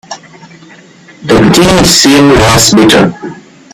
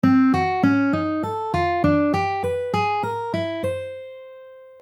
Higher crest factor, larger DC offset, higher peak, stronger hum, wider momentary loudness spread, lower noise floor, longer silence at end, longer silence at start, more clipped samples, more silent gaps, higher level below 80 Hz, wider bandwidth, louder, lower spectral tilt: second, 8 dB vs 16 dB; neither; first, 0 dBFS vs -4 dBFS; neither; first, 21 LU vs 15 LU; second, -35 dBFS vs -43 dBFS; first, 0.35 s vs 0.1 s; about the same, 0.1 s vs 0.05 s; first, 0.7% vs under 0.1%; neither; first, -28 dBFS vs -50 dBFS; first, over 20 kHz vs 11 kHz; first, -5 LUFS vs -21 LUFS; second, -4 dB/octave vs -7.5 dB/octave